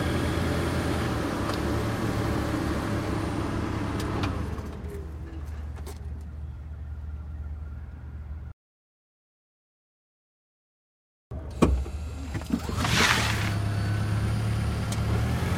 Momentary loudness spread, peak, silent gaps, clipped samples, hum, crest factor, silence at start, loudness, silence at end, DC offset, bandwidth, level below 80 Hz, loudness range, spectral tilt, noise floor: 14 LU; -6 dBFS; 8.53-11.31 s; under 0.1%; none; 24 dB; 0 s; -29 LUFS; 0 s; under 0.1%; 16 kHz; -38 dBFS; 17 LU; -5.5 dB/octave; under -90 dBFS